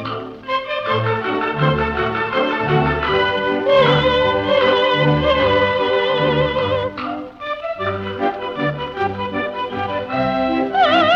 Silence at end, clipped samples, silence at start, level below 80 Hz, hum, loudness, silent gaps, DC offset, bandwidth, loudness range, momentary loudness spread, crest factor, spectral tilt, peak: 0 s; under 0.1%; 0 s; -40 dBFS; none; -18 LUFS; none; under 0.1%; 7 kHz; 7 LU; 9 LU; 14 dB; -7 dB/octave; -4 dBFS